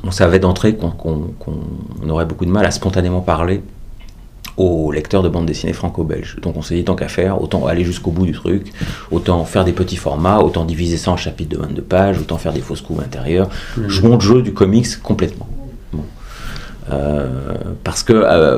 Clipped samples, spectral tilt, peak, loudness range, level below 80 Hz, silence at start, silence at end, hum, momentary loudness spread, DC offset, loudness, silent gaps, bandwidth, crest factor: under 0.1%; -6.5 dB/octave; 0 dBFS; 4 LU; -30 dBFS; 0 s; 0 s; none; 14 LU; under 0.1%; -16 LUFS; none; 15 kHz; 16 dB